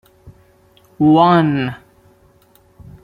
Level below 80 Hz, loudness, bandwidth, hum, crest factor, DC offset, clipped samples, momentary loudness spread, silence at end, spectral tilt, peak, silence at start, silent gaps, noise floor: -52 dBFS; -14 LUFS; 5.2 kHz; none; 16 dB; under 0.1%; under 0.1%; 15 LU; 1.25 s; -9 dB/octave; -2 dBFS; 0.25 s; none; -52 dBFS